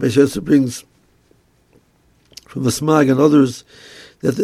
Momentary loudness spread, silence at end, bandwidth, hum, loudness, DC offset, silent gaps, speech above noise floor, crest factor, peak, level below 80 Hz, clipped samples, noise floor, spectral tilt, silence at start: 17 LU; 0 s; 14.5 kHz; none; -16 LUFS; under 0.1%; none; 42 dB; 18 dB; 0 dBFS; -52 dBFS; under 0.1%; -57 dBFS; -6 dB/octave; 0 s